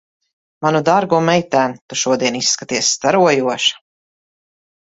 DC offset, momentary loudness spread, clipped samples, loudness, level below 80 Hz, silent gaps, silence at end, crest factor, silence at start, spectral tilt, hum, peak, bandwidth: under 0.1%; 5 LU; under 0.1%; -16 LUFS; -60 dBFS; 1.81-1.89 s; 1.2 s; 16 dB; 0.6 s; -3 dB/octave; none; 0 dBFS; 8 kHz